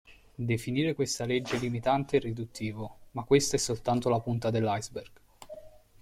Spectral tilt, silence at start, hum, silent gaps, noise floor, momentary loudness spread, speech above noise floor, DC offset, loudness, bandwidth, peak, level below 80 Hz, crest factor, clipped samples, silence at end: -5 dB/octave; 0.1 s; none; none; -49 dBFS; 17 LU; 19 dB; under 0.1%; -30 LUFS; 15.5 kHz; -10 dBFS; -56 dBFS; 20 dB; under 0.1%; 0.35 s